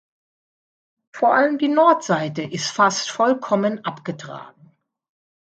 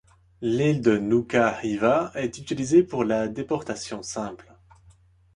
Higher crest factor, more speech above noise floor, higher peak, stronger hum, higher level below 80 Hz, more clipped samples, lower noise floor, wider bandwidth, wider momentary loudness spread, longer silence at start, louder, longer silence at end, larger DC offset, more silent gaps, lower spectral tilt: about the same, 20 dB vs 18 dB; about the same, 35 dB vs 33 dB; first, -2 dBFS vs -6 dBFS; neither; second, -72 dBFS vs -56 dBFS; neither; about the same, -55 dBFS vs -56 dBFS; second, 9 kHz vs 11 kHz; first, 15 LU vs 12 LU; first, 1.15 s vs 0.4 s; first, -19 LUFS vs -24 LUFS; about the same, 1 s vs 1 s; neither; neither; second, -4.5 dB/octave vs -6 dB/octave